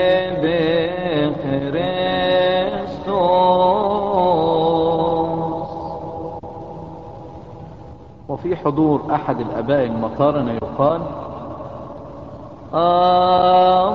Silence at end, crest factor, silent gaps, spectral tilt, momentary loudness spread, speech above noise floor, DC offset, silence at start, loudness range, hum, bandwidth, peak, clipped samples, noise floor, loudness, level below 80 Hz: 0 s; 16 dB; none; -8.5 dB/octave; 21 LU; 22 dB; 0.3%; 0 s; 8 LU; none; 5.6 kHz; -4 dBFS; under 0.1%; -39 dBFS; -18 LUFS; -46 dBFS